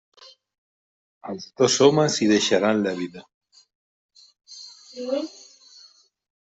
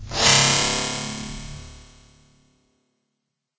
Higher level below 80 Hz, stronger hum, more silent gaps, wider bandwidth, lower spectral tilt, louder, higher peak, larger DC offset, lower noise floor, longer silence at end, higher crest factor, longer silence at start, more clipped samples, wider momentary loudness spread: second, -68 dBFS vs -44 dBFS; neither; first, 3.34-3.41 s, 3.75-4.09 s vs none; about the same, 8.2 kHz vs 8 kHz; first, -4 dB/octave vs -1.5 dB/octave; second, -21 LUFS vs -18 LUFS; about the same, -4 dBFS vs -2 dBFS; neither; second, -55 dBFS vs -79 dBFS; second, 1.15 s vs 1.75 s; about the same, 22 dB vs 24 dB; first, 1.25 s vs 0 s; neither; about the same, 24 LU vs 23 LU